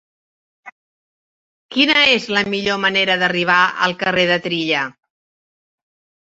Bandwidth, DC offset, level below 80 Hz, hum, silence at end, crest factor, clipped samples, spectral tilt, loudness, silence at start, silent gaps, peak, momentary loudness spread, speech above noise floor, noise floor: 8 kHz; under 0.1%; -60 dBFS; none; 1.4 s; 18 dB; under 0.1%; -4 dB/octave; -15 LUFS; 0.65 s; 0.72-1.69 s; -2 dBFS; 7 LU; over 73 dB; under -90 dBFS